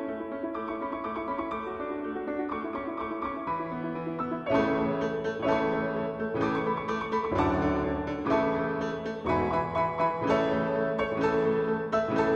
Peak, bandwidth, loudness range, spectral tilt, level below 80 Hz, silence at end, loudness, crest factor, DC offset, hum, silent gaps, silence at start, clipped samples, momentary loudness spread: -12 dBFS; 8 kHz; 5 LU; -7.5 dB/octave; -50 dBFS; 0 s; -29 LUFS; 16 dB; under 0.1%; none; none; 0 s; under 0.1%; 8 LU